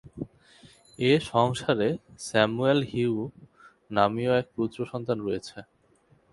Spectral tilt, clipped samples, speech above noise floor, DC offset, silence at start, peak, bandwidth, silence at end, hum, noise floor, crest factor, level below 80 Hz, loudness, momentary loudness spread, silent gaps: -6 dB/octave; under 0.1%; 37 dB; under 0.1%; 0.05 s; -6 dBFS; 11.5 kHz; 0.7 s; none; -63 dBFS; 22 dB; -60 dBFS; -26 LUFS; 16 LU; none